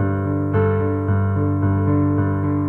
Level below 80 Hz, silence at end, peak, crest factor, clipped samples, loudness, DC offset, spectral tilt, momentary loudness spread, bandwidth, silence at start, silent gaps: -44 dBFS; 0 s; -6 dBFS; 12 dB; under 0.1%; -19 LUFS; under 0.1%; -12 dB/octave; 2 LU; 3.1 kHz; 0 s; none